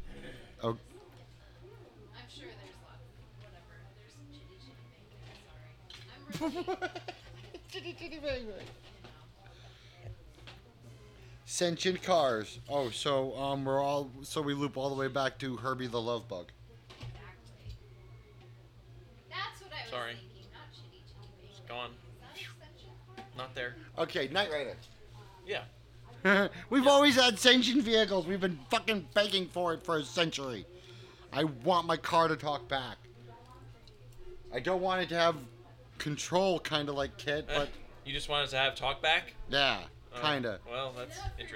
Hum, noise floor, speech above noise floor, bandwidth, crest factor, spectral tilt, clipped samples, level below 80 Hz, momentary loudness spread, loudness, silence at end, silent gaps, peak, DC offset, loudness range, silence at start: none; -55 dBFS; 23 dB; 17 kHz; 28 dB; -4 dB/octave; under 0.1%; -56 dBFS; 25 LU; -32 LUFS; 0 s; none; -6 dBFS; under 0.1%; 20 LU; 0 s